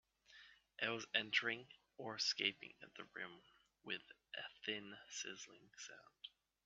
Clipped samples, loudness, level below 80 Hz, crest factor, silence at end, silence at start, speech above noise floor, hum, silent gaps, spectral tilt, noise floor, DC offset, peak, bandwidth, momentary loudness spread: under 0.1%; -44 LUFS; -88 dBFS; 28 dB; 0.4 s; 0.3 s; 19 dB; none; none; 0.5 dB/octave; -66 dBFS; under 0.1%; -20 dBFS; 8 kHz; 23 LU